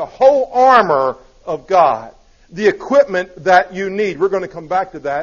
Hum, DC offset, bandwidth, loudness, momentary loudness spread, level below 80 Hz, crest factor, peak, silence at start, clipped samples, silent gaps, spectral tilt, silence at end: none; under 0.1%; 7.2 kHz; -15 LUFS; 13 LU; -50 dBFS; 14 dB; 0 dBFS; 0 s; under 0.1%; none; -5 dB/octave; 0 s